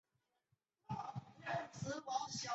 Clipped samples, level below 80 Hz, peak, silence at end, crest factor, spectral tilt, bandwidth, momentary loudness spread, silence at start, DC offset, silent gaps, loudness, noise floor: under 0.1%; -76 dBFS; -28 dBFS; 0 s; 18 dB; -3.5 dB/octave; 8 kHz; 7 LU; 0.9 s; under 0.1%; none; -45 LUFS; -85 dBFS